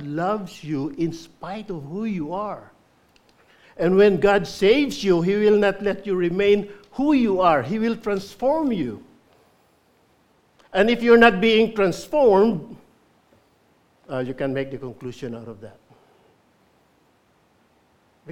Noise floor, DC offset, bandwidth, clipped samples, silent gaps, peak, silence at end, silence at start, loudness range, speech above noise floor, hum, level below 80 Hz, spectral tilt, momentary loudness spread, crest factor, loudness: -61 dBFS; under 0.1%; 14.5 kHz; under 0.1%; none; 0 dBFS; 0 s; 0 s; 14 LU; 41 dB; none; -52 dBFS; -6 dB/octave; 18 LU; 22 dB; -20 LUFS